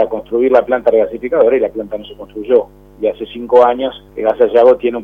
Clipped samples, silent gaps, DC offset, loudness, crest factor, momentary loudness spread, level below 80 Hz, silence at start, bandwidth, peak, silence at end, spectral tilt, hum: 0.1%; none; under 0.1%; -13 LUFS; 14 dB; 16 LU; -46 dBFS; 0 s; 4.3 kHz; 0 dBFS; 0 s; -7 dB/octave; 50 Hz at -45 dBFS